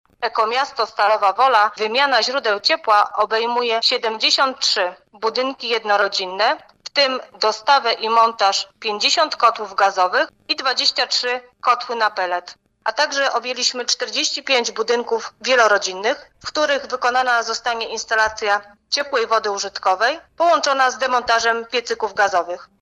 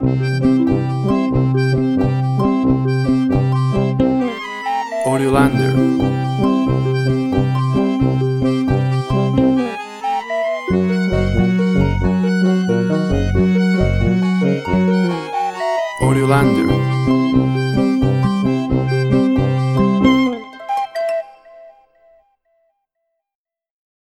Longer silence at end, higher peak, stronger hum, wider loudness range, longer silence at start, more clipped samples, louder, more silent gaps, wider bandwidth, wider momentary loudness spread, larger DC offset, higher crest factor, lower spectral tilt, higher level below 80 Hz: second, 0.2 s vs 2.4 s; about the same, -2 dBFS vs 0 dBFS; neither; about the same, 3 LU vs 2 LU; first, 0.2 s vs 0 s; neither; about the same, -18 LUFS vs -16 LUFS; neither; about the same, 11.5 kHz vs 12 kHz; about the same, 7 LU vs 6 LU; neither; about the same, 18 dB vs 16 dB; second, 0 dB/octave vs -8 dB/octave; second, -62 dBFS vs -34 dBFS